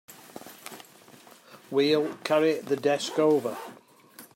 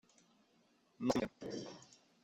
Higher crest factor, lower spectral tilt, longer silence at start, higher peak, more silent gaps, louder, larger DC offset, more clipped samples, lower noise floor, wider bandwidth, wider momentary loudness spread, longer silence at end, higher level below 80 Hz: second, 18 dB vs 26 dB; about the same, -4.5 dB/octave vs -5 dB/octave; second, 0.1 s vs 1 s; first, -10 dBFS vs -18 dBFS; neither; first, -26 LUFS vs -41 LUFS; neither; neither; second, -52 dBFS vs -74 dBFS; first, 16.5 kHz vs 14.5 kHz; first, 21 LU vs 15 LU; second, 0.1 s vs 0.3 s; second, -80 dBFS vs -70 dBFS